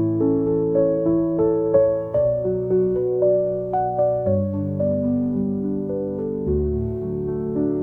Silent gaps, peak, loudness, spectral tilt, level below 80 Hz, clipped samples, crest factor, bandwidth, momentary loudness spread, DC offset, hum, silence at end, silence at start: none; -6 dBFS; -21 LUFS; -13 dB/octave; -40 dBFS; under 0.1%; 14 dB; 2.4 kHz; 6 LU; 0.1%; none; 0 s; 0 s